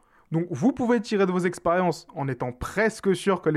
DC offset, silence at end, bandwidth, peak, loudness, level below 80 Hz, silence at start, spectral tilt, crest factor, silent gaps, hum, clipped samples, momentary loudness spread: under 0.1%; 0 s; 13.5 kHz; -10 dBFS; -25 LUFS; -52 dBFS; 0.3 s; -6.5 dB/octave; 14 dB; none; none; under 0.1%; 8 LU